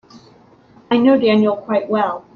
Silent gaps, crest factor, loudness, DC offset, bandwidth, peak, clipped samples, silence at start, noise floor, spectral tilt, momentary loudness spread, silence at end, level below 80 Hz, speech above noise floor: none; 14 dB; -16 LUFS; under 0.1%; 6.4 kHz; -2 dBFS; under 0.1%; 0.15 s; -48 dBFS; -8 dB/octave; 7 LU; 0.15 s; -62 dBFS; 33 dB